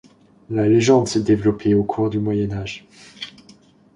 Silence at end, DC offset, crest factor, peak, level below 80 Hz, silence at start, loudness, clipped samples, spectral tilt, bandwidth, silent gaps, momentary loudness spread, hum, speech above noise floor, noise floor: 0.65 s; under 0.1%; 18 dB; -2 dBFS; -48 dBFS; 0.5 s; -19 LUFS; under 0.1%; -6.5 dB/octave; 11 kHz; none; 19 LU; none; 32 dB; -50 dBFS